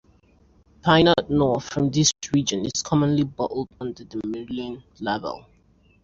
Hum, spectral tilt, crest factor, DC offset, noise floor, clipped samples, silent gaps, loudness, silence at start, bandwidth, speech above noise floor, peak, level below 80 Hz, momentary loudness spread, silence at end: none; -4.5 dB/octave; 20 dB; under 0.1%; -57 dBFS; under 0.1%; none; -23 LUFS; 0.85 s; 7.8 kHz; 35 dB; -4 dBFS; -50 dBFS; 15 LU; 0.65 s